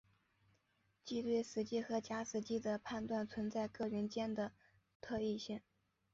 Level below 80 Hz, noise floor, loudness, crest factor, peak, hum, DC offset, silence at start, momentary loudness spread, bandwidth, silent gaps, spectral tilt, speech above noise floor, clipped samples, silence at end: -72 dBFS; -80 dBFS; -42 LUFS; 16 dB; -26 dBFS; none; under 0.1%; 1.05 s; 7 LU; 7.6 kHz; 4.95-5.00 s; -5 dB/octave; 39 dB; under 0.1%; 0.55 s